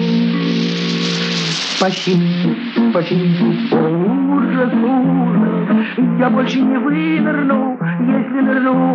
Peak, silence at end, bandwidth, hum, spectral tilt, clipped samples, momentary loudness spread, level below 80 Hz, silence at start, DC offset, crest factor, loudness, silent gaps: -2 dBFS; 0 s; 8.2 kHz; none; -6 dB/octave; under 0.1%; 3 LU; -78 dBFS; 0 s; under 0.1%; 12 dB; -15 LUFS; none